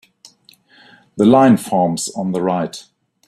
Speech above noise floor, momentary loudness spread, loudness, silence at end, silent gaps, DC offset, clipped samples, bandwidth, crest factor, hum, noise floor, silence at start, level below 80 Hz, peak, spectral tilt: 36 dB; 16 LU; -15 LUFS; 0.45 s; none; under 0.1%; under 0.1%; 13.5 kHz; 16 dB; none; -51 dBFS; 1.15 s; -58 dBFS; -2 dBFS; -6 dB/octave